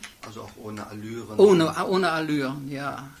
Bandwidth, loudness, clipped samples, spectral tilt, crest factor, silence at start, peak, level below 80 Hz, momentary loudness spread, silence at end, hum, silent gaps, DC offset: 15.5 kHz; -23 LUFS; under 0.1%; -6 dB/octave; 20 dB; 0 s; -4 dBFS; -60 dBFS; 22 LU; 0.1 s; none; none; under 0.1%